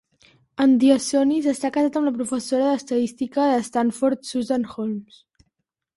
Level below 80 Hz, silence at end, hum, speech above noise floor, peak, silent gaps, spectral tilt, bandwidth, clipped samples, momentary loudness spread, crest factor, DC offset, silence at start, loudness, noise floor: -64 dBFS; 0.95 s; none; 55 dB; -6 dBFS; none; -4.5 dB/octave; 11.5 kHz; under 0.1%; 10 LU; 16 dB; under 0.1%; 0.6 s; -21 LUFS; -76 dBFS